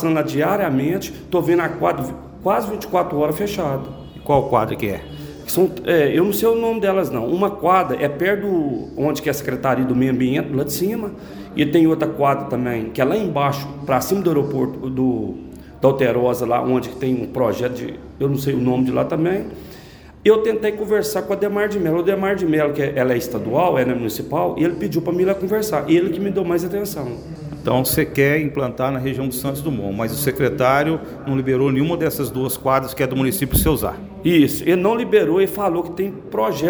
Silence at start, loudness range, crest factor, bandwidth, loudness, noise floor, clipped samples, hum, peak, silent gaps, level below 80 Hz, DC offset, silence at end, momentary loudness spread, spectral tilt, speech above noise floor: 0 s; 3 LU; 18 dB; over 20 kHz; -19 LUFS; -41 dBFS; under 0.1%; none; -2 dBFS; none; -42 dBFS; under 0.1%; 0 s; 8 LU; -6 dB/octave; 22 dB